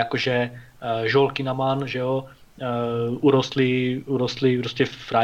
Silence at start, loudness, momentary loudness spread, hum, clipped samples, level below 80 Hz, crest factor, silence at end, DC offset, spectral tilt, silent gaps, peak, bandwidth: 0 s; -23 LUFS; 9 LU; none; under 0.1%; -56 dBFS; 16 dB; 0 s; under 0.1%; -6.5 dB/octave; none; -6 dBFS; 8.4 kHz